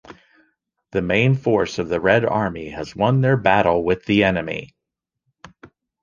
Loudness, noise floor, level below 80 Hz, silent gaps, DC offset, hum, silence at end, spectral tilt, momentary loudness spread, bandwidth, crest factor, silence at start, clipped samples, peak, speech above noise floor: -19 LUFS; -82 dBFS; -46 dBFS; none; under 0.1%; none; 0.35 s; -7 dB/octave; 11 LU; 7.2 kHz; 20 dB; 0.1 s; under 0.1%; -2 dBFS; 64 dB